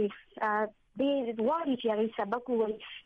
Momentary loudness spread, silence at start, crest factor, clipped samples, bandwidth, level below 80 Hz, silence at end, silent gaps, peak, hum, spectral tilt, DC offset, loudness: 4 LU; 0 s; 12 dB; under 0.1%; 5.2 kHz; -70 dBFS; 0.05 s; none; -20 dBFS; none; -7.5 dB/octave; under 0.1%; -32 LUFS